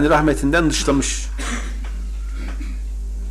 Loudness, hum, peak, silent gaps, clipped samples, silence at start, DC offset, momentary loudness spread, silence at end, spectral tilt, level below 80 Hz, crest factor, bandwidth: -21 LUFS; none; -6 dBFS; none; under 0.1%; 0 s; under 0.1%; 13 LU; 0 s; -4.5 dB/octave; -26 dBFS; 14 dB; 13.5 kHz